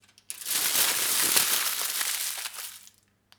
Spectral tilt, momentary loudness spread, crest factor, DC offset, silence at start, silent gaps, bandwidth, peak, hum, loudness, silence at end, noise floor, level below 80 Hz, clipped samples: 2 dB/octave; 16 LU; 24 dB; under 0.1%; 0.3 s; none; over 20 kHz; -4 dBFS; none; -24 LUFS; 0.55 s; -62 dBFS; -70 dBFS; under 0.1%